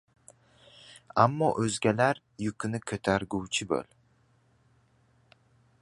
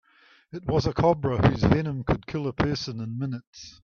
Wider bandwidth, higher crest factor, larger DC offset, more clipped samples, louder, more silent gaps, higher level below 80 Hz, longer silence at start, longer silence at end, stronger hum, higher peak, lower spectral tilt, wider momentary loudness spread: first, 11.5 kHz vs 7 kHz; first, 26 dB vs 20 dB; neither; neither; second, -29 LUFS vs -26 LUFS; second, none vs 3.47-3.53 s; second, -60 dBFS vs -42 dBFS; first, 0.9 s vs 0.55 s; first, 2 s vs 0.15 s; neither; about the same, -6 dBFS vs -6 dBFS; second, -5 dB/octave vs -7.5 dB/octave; about the same, 11 LU vs 13 LU